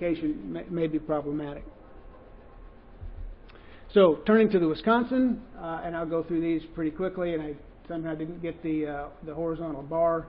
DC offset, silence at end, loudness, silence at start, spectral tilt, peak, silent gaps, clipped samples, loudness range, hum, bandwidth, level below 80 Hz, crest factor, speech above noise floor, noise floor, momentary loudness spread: under 0.1%; 0 s; -28 LUFS; 0 s; -11 dB/octave; -8 dBFS; none; under 0.1%; 9 LU; none; 5.4 kHz; -48 dBFS; 20 dB; 21 dB; -48 dBFS; 17 LU